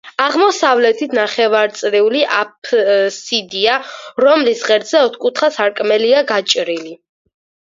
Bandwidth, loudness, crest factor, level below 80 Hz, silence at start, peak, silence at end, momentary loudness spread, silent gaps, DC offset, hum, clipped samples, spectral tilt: 7.6 kHz; -14 LUFS; 14 dB; -68 dBFS; 0.05 s; 0 dBFS; 0.8 s; 6 LU; 2.58-2.62 s; under 0.1%; none; under 0.1%; -2 dB/octave